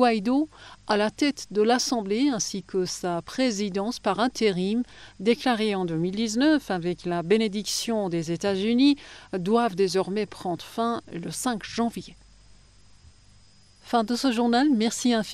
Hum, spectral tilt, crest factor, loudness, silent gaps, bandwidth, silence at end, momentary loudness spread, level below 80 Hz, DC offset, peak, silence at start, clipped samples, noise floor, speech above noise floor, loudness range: none; -4.5 dB/octave; 18 dB; -25 LUFS; none; 13 kHz; 0 s; 8 LU; -58 dBFS; under 0.1%; -8 dBFS; 0 s; under 0.1%; -56 dBFS; 31 dB; 6 LU